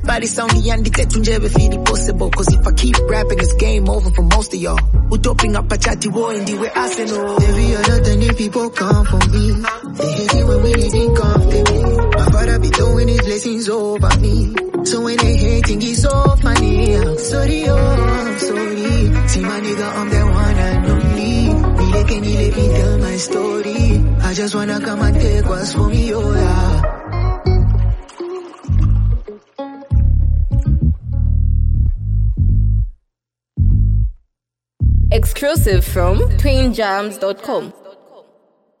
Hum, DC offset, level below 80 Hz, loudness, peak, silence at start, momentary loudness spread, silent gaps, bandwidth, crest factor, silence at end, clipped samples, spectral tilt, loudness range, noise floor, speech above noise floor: none; under 0.1%; -16 dBFS; -16 LUFS; 0 dBFS; 0 s; 6 LU; none; 14.5 kHz; 14 dB; 0.9 s; under 0.1%; -5.5 dB/octave; 3 LU; -81 dBFS; 67 dB